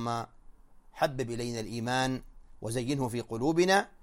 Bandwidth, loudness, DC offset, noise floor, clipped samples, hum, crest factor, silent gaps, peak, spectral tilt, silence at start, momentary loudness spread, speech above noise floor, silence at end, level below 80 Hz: 16 kHz; -31 LUFS; under 0.1%; -53 dBFS; under 0.1%; none; 20 dB; none; -12 dBFS; -5 dB/octave; 0 s; 11 LU; 22 dB; 0.15 s; -54 dBFS